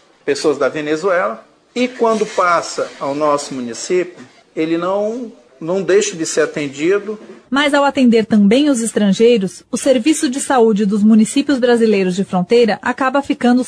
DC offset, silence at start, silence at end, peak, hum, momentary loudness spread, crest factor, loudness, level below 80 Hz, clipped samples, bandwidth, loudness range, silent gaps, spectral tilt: under 0.1%; 0.25 s; 0 s; -2 dBFS; none; 10 LU; 12 dB; -15 LUFS; -60 dBFS; under 0.1%; 11 kHz; 5 LU; none; -5 dB/octave